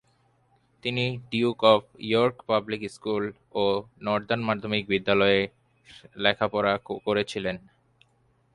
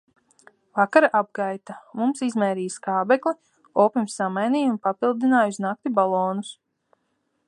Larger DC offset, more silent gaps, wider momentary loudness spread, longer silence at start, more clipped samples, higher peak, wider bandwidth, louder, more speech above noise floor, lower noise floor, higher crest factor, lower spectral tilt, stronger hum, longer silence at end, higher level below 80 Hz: neither; neither; about the same, 11 LU vs 10 LU; about the same, 0.85 s vs 0.75 s; neither; about the same, -4 dBFS vs -2 dBFS; about the same, 11.5 kHz vs 11.5 kHz; second, -26 LUFS vs -23 LUFS; second, 40 dB vs 50 dB; second, -66 dBFS vs -73 dBFS; about the same, 22 dB vs 22 dB; about the same, -6 dB/octave vs -5.5 dB/octave; neither; about the same, 0.95 s vs 0.95 s; first, -60 dBFS vs -78 dBFS